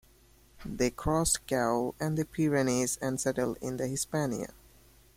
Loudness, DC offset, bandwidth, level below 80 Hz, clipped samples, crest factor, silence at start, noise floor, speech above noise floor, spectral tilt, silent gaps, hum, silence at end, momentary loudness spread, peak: -30 LUFS; under 0.1%; 16.5 kHz; -50 dBFS; under 0.1%; 18 dB; 0.6 s; -60 dBFS; 30 dB; -4.5 dB/octave; none; none; 0.65 s; 7 LU; -14 dBFS